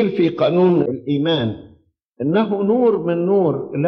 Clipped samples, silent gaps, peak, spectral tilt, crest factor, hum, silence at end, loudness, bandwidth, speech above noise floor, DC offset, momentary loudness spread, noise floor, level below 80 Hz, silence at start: under 0.1%; 2.05-2.12 s; -6 dBFS; -9.5 dB/octave; 12 dB; none; 0 s; -18 LUFS; 5.8 kHz; 37 dB; under 0.1%; 5 LU; -54 dBFS; -60 dBFS; 0 s